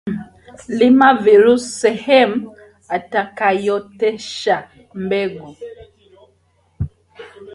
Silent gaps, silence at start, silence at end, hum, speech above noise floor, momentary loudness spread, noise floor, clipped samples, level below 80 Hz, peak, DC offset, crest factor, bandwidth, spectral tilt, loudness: none; 0.05 s; 0 s; none; 44 dB; 20 LU; -59 dBFS; under 0.1%; -46 dBFS; 0 dBFS; under 0.1%; 16 dB; 11.5 kHz; -5 dB/octave; -16 LUFS